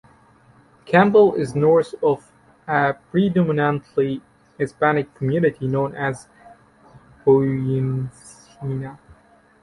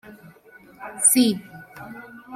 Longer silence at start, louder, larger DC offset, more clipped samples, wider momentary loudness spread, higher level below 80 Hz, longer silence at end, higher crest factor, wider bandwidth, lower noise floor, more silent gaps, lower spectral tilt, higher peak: first, 0.85 s vs 0.1 s; about the same, -20 LUFS vs -18 LUFS; neither; neither; second, 13 LU vs 25 LU; first, -56 dBFS vs -66 dBFS; first, 0.65 s vs 0 s; about the same, 18 dB vs 20 dB; second, 11.5 kHz vs 16 kHz; about the same, -53 dBFS vs -50 dBFS; neither; first, -8 dB/octave vs -2.5 dB/octave; about the same, -2 dBFS vs -4 dBFS